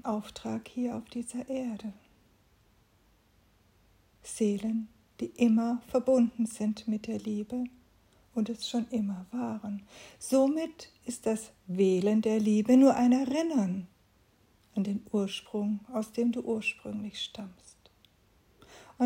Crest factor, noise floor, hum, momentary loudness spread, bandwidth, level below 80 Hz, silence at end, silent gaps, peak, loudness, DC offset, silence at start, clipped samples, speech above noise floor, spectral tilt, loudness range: 20 dB; -66 dBFS; none; 15 LU; 16 kHz; -68 dBFS; 0 s; none; -10 dBFS; -30 LUFS; under 0.1%; 0.05 s; under 0.1%; 36 dB; -6 dB/octave; 11 LU